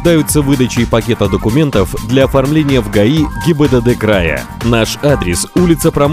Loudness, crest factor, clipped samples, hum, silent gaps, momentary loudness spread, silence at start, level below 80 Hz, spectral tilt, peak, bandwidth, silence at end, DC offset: -12 LUFS; 10 dB; 0.5%; none; none; 3 LU; 0 s; -26 dBFS; -5.5 dB/octave; 0 dBFS; 16.5 kHz; 0 s; under 0.1%